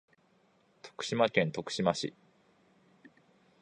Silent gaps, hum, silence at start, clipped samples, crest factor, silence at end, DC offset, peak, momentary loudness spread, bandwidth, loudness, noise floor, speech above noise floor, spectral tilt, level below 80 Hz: none; none; 0.85 s; under 0.1%; 24 dB; 1.5 s; under 0.1%; -12 dBFS; 18 LU; 11 kHz; -32 LUFS; -69 dBFS; 38 dB; -4.5 dB/octave; -72 dBFS